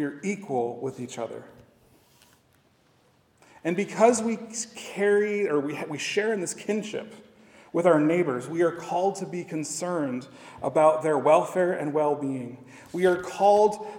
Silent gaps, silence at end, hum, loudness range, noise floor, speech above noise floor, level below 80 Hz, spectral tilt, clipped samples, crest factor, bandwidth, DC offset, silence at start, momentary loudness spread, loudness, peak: none; 0 s; none; 6 LU; -63 dBFS; 38 dB; -72 dBFS; -5 dB/octave; under 0.1%; 20 dB; 17.5 kHz; under 0.1%; 0 s; 14 LU; -26 LUFS; -6 dBFS